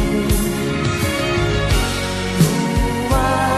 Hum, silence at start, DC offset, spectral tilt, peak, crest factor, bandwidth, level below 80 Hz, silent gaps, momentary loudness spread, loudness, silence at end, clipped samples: none; 0 s; under 0.1%; -5 dB/octave; -2 dBFS; 14 dB; 13 kHz; -26 dBFS; none; 4 LU; -18 LUFS; 0 s; under 0.1%